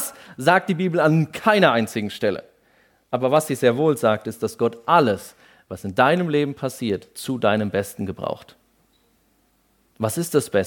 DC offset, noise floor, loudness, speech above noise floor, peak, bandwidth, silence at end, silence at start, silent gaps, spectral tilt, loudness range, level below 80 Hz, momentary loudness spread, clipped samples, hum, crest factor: under 0.1%; -63 dBFS; -21 LUFS; 43 dB; -2 dBFS; 18 kHz; 0 s; 0 s; none; -5.5 dB/octave; 6 LU; -62 dBFS; 12 LU; under 0.1%; none; 20 dB